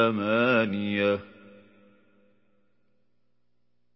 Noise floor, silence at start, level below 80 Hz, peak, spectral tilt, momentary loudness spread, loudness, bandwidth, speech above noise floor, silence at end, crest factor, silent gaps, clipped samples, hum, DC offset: -78 dBFS; 0 s; -66 dBFS; -10 dBFS; -10 dB/octave; 5 LU; -25 LUFS; 5.8 kHz; 53 dB; 2.7 s; 20 dB; none; under 0.1%; 60 Hz at -65 dBFS; under 0.1%